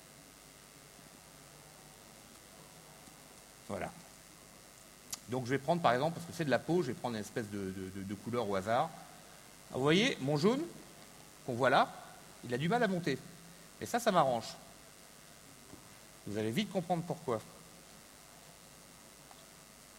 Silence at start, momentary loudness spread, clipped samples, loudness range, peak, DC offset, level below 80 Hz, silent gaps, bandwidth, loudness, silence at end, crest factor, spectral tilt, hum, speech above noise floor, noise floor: 0 s; 24 LU; under 0.1%; 16 LU; -14 dBFS; under 0.1%; -70 dBFS; none; 16 kHz; -35 LUFS; 0 s; 22 dB; -5 dB/octave; none; 23 dB; -57 dBFS